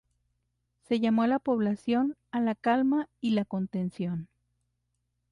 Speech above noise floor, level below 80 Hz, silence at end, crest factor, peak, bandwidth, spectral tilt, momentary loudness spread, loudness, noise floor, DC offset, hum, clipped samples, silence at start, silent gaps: 51 dB; -68 dBFS; 1.05 s; 14 dB; -14 dBFS; 10.5 kHz; -8 dB/octave; 7 LU; -29 LUFS; -79 dBFS; under 0.1%; 60 Hz at -50 dBFS; under 0.1%; 0.9 s; none